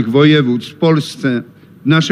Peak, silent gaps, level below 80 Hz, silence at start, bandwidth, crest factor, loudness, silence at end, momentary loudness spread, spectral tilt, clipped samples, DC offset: 0 dBFS; none; -60 dBFS; 0 s; 12 kHz; 14 dB; -14 LUFS; 0 s; 10 LU; -6.5 dB/octave; under 0.1%; under 0.1%